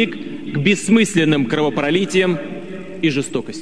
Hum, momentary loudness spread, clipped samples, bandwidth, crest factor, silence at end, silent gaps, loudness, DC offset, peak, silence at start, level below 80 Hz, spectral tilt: none; 14 LU; under 0.1%; 11 kHz; 16 dB; 0 s; none; -17 LUFS; 1%; -2 dBFS; 0 s; -56 dBFS; -5 dB/octave